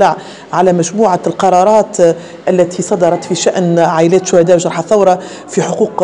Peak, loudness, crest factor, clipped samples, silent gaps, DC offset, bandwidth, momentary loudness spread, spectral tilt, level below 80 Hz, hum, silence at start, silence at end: 0 dBFS; -11 LUFS; 10 dB; 0.2%; none; 0.2%; 11 kHz; 7 LU; -5.5 dB/octave; -54 dBFS; none; 0 s; 0 s